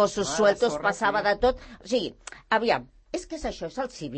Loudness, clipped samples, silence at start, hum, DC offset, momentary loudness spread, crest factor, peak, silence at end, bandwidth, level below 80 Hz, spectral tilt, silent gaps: -26 LUFS; under 0.1%; 0 s; none; under 0.1%; 13 LU; 18 dB; -8 dBFS; 0 s; 8.8 kHz; -48 dBFS; -3.5 dB/octave; none